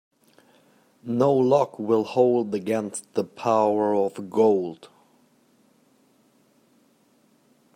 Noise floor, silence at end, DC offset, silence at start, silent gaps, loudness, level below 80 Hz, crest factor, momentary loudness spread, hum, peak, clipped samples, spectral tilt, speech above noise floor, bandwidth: -62 dBFS; 2.9 s; under 0.1%; 1.05 s; none; -23 LUFS; -74 dBFS; 20 dB; 9 LU; none; -6 dBFS; under 0.1%; -6.5 dB/octave; 40 dB; 14.5 kHz